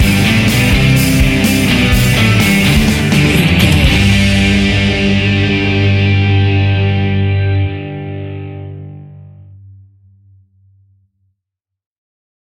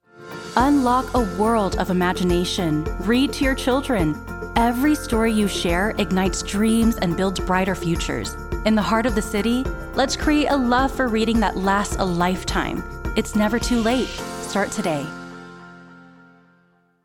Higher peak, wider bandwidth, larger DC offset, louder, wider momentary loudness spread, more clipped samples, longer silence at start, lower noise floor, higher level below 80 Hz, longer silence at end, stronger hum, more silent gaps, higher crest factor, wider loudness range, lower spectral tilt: about the same, 0 dBFS vs -2 dBFS; about the same, 17 kHz vs 17.5 kHz; neither; first, -11 LUFS vs -21 LUFS; first, 14 LU vs 8 LU; neither; second, 0 s vs 0.15 s; first, -79 dBFS vs -60 dBFS; first, -22 dBFS vs -34 dBFS; first, 3.25 s vs 1 s; neither; neither; second, 12 dB vs 20 dB; first, 14 LU vs 3 LU; about the same, -5.5 dB/octave vs -5 dB/octave